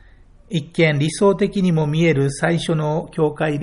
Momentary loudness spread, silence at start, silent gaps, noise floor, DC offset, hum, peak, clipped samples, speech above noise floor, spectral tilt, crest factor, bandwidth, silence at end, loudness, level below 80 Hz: 6 LU; 0.5 s; none; -47 dBFS; under 0.1%; none; -4 dBFS; under 0.1%; 29 dB; -6.5 dB/octave; 16 dB; 11 kHz; 0 s; -19 LUFS; -46 dBFS